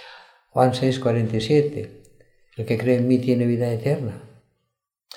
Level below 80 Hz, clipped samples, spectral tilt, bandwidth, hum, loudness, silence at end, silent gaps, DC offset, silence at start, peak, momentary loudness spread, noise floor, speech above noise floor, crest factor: -58 dBFS; under 0.1%; -7.5 dB/octave; 13.5 kHz; none; -22 LUFS; 0.9 s; none; under 0.1%; 0 s; -4 dBFS; 15 LU; -78 dBFS; 57 dB; 20 dB